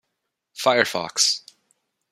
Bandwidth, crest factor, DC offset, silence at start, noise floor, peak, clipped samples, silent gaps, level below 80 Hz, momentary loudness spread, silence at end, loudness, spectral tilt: 16 kHz; 22 dB; under 0.1%; 0.55 s; -79 dBFS; -2 dBFS; under 0.1%; none; -74 dBFS; 9 LU; 0.75 s; -21 LUFS; -1 dB/octave